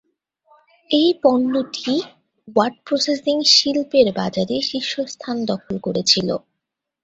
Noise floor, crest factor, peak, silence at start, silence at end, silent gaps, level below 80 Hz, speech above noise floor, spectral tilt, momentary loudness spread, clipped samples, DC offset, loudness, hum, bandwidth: -80 dBFS; 18 dB; -2 dBFS; 0.9 s; 0.65 s; none; -60 dBFS; 61 dB; -3.5 dB/octave; 11 LU; under 0.1%; under 0.1%; -19 LUFS; none; 8.2 kHz